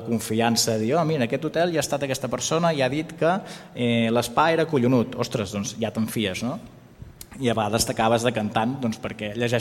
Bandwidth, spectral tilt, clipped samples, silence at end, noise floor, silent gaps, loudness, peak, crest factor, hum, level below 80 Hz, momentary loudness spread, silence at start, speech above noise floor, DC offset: 16.5 kHz; -4.5 dB/octave; under 0.1%; 0 s; -44 dBFS; none; -24 LUFS; -4 dBFS; 18 dB; none; -54 dBFS; 8 LU; 0 s; 20 dB; under 0.1%